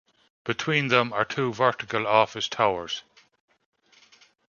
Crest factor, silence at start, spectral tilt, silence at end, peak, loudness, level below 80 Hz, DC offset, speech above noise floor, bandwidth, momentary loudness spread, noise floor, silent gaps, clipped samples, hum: 24 dB; 0.45 s; -4.5 dB/octave; 1.5 s; -2 dBFS; -24 LUFS; -66 dBFS; under 0.1%; 34 dB; 7.2 kHz; 11 LU; -58 dBFS; none; under 0.1%; none